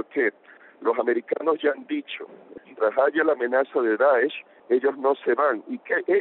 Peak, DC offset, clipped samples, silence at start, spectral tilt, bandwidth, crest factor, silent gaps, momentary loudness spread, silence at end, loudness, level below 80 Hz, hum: -8 dBFS; under 0.1%; under 0.1%; 0 s; -1.5 dB/octave; 4.2 kHz; 16 dB; none; 10 LU; 0 s; -24 LUFS; -76 dBFS; none